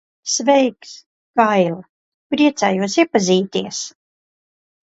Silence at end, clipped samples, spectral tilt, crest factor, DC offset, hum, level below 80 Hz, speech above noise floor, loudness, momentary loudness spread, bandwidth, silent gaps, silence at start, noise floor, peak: 1 s; under 0.1%; -4 dB/octave; 18 dB; under 0.1%; none; -66 dBFS; over 73 dB; -17 LUFS; 14 LU; 8.2 kHz; 1.06-1.34 s, 1.89-2.30 s; 0.25 s; under -90 dBFS; 0 dBFS